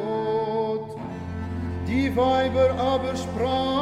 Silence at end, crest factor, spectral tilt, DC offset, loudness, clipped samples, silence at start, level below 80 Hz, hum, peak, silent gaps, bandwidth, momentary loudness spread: 0 s; 14 dB; -6.5 dB/octave; under 0.1%; -25 LUFS; under 0.1%; 0 s; -44 dBFS; none; -10 dBFS; none; 12.5 kHz; 11 LU